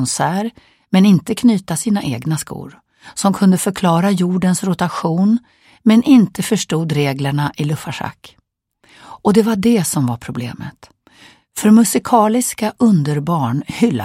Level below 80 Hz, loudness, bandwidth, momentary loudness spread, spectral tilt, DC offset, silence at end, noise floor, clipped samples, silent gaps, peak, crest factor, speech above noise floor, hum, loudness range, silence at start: -54 dBFS; -16 LUFS; 16 kHz; 14 LU; -5.5 dB/octave; under 0.1%; 0 s; -59 dBFS; under 0.1%; none; 0 dBFS; 16 dB; 44 dB; none; 4 LU; 0 s